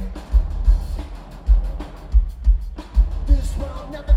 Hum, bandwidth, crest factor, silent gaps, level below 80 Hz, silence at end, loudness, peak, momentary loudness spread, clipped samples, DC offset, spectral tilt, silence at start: none; 7.8 kHz; 14 dB; none; -18 dBFS; 0 s; -23 LUFS; -4 dBFS; 11 LU; under 0.1%; under 0.1%; -7.5 dB/octave; 0 s